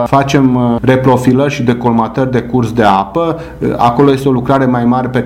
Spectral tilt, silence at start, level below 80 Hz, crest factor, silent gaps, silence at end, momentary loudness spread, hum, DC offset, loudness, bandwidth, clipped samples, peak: -7.5 dB/octave; 0 s; -36 dBFS; 10 dB; none; 0 s; 5 LU; none; under 0.1%; -11 LUFS; 15 kHz; 0.2%; 0 dBFS